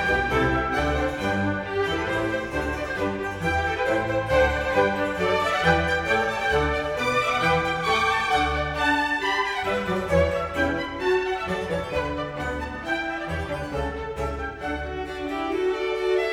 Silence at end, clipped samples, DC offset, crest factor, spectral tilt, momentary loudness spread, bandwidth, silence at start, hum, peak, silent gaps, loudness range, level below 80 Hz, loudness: 0 s; under 0.1%; under 0.1%; 18 dB; -5 dB/octave; 8 LU; 17 kHz; 0 s; none; -6 dBFS; none; 6 LU; -38 dBFS; -24 LUFS